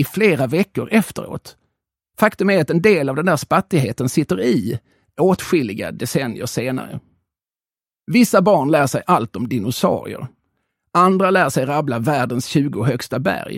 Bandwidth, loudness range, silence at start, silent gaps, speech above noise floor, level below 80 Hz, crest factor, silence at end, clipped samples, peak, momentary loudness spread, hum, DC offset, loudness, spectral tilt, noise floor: 16.5 kHz; 3 LU; 0 s; none; over 73 dB; -54 dBFS; 18 dB; 0 s; under 0.1%; 0 dBFS; 12 LU; none; under 0.1%; -18 LUFS; -6 dB/octave; under -90 dBFS